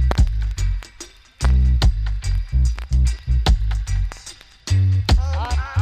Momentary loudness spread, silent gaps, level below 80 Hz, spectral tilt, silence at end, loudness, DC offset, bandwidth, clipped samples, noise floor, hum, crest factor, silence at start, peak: 15 LU; none; -20 dBFS; -5.5 dB/octave; 0 s; -21 LUFS; under 0.1%; 9.6 kHz; under 0.1%; -41 dBFS; none; 14 dB; 0 s; -4 dBFS